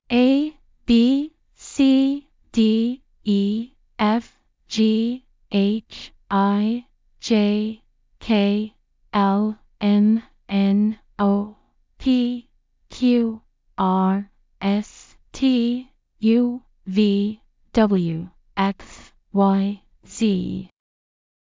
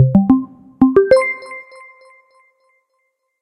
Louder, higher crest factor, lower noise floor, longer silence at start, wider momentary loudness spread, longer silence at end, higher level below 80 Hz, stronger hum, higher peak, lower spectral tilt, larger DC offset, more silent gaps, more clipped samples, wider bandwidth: second, -21 LUFS vs -14 LUFS; about the same, 16 dB vs 16 dB; second, -60 dBFS vs -69 dBFS; about the same, 0.1 s vs 0 s; second, 16 LU vs 21 LU; second, 0.85 s vs 1.8 s; second, -52 dBFS vs -46 dBFS; neither; second, -4 dBFS vs 0 dBFS; second, -7 dB/octave vs -8.5 dB/octave; neither; neither; neither; second, 7.6 kHz vs 11 kHz